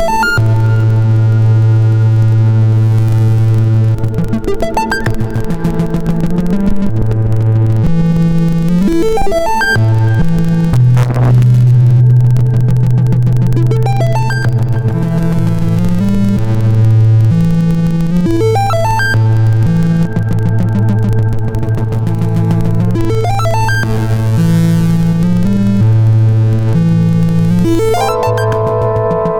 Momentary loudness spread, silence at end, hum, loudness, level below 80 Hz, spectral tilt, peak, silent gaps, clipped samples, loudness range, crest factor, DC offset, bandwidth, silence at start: 5 LU; 0 s; none; -11 LUFS; -24 dBFS; -8 dB/octave; -2 dBFS; none; under 0.1%; 4 LU; 8 dB; under 0.1%; 12 kHz; 0 s